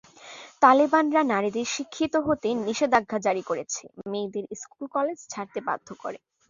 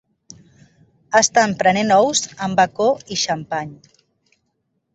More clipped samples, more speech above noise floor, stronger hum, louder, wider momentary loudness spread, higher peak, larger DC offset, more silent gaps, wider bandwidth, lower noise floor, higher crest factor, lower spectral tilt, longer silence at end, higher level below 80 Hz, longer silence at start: neither; second, 21 dB vs 53 dB; neither; second, -25 LUFS vs -17 LUFS; first, 17 LU vs 10 LU; second, -4 dBFS vs 0 dBFS; neither; neither; second, 7.6 kHz vs 8.4 kHz; second, -46 dBFS vs -71 dBFS; about the same, 22 dB vs 18 dB; about the same, -4 dB/octave vs -3 dB/octave; second, 0.35 s vs 1.2 s; about the same, -64 dBFS vs -60 dBFS; second, 0.2 s vs 1.1 s